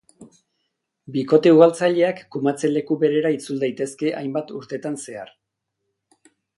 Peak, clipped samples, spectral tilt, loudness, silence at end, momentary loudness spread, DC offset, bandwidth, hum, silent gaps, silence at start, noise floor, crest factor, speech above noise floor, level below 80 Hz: 0 dBFS; under 0.1%; -6 dB/octave; -20 LUFS; 1.3 s; 16 LU; under 0.1%; 11.5 kHz; none; none; 0.2 s; -79 dBFS; 20 dB; 59 dB; -72 dBFS